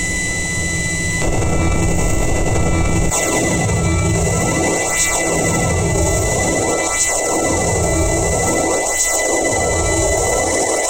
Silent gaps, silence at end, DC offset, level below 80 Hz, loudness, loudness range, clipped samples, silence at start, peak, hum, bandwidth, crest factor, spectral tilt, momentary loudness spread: none; 0 s; under 0.1%; -26 dBFS; -16 LUFS; 2 LU; under 0.1%; 0 s; -4 dBFS; none; 16 kHz; 12 dB; -3.5 dB/octave; 3 LU